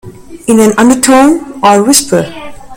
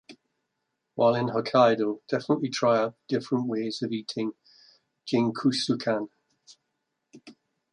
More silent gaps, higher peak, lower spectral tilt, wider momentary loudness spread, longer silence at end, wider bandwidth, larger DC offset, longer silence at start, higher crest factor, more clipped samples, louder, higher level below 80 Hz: neither; first, 0 dBFS vs -8 dBFS; second, -3.5 dB/octave vs -5.5 dB/octave; about the same, 13 LU vs 11 LU; second, 0 s vs 0.4 s; first, over 20 kHz vs 11 kHz; neither; about the same, 0.05 s vs 0.1 s; second, 8 dB vs 20 dB; first, 2% vs under 0.1%; first, -7 LUFS vs -26 LUFS; first, -40 dBFS vs -74 dBFS